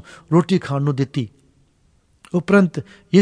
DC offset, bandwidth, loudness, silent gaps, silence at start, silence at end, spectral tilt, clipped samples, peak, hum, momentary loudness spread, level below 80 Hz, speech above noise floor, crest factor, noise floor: under 0.1%; 10.5 kHz; -19 LUFS; none; 0.3 s; 0 s; -7.5 dB/octave; under 0.1%; -2 dBFS; none; 11 LU; -58 dBFS; 41 dB; 18 dB; -59 dBFS